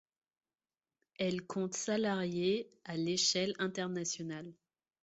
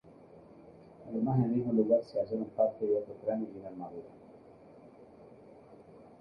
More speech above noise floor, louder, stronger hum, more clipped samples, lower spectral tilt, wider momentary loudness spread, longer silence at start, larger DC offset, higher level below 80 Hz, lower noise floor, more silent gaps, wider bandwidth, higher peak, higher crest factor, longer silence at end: first, over 54 dB vs 24 dB; second, -35 LUFS vs -32 LUFS; neither; neither; second, -3.5 dB/octave vs -11.5 dB/octave; second, 11 LU vs 24 LU; first, 1.2 s vs 0.05 s; neither; second, -76 dBFS vs -70 dBFS; first, under -90 dBFS vs -55 dBFS; neither; first, 8 kHz vs 5.8 kHz; second, -20 dBFS vs -14 dBFS; about the same, 18 dB vs 20 dB; first, 0.5 s vs 0.15 s